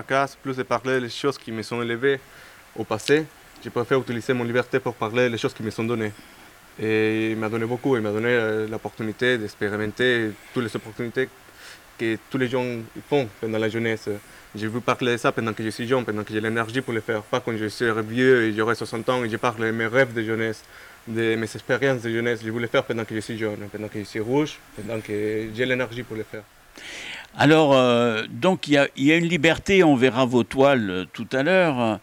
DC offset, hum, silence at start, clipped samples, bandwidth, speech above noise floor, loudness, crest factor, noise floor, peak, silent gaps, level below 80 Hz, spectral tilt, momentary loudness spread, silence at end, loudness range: under 0.1%; none; 0 s; under 0.1%; 17 kHz; 22 dB; -23 LUFS; 18 dB; -45 dBFS; -6 dBFS; none; -56 dBFS; -5.5 dB/octave; 13 LU; 0.05 s; 8 LU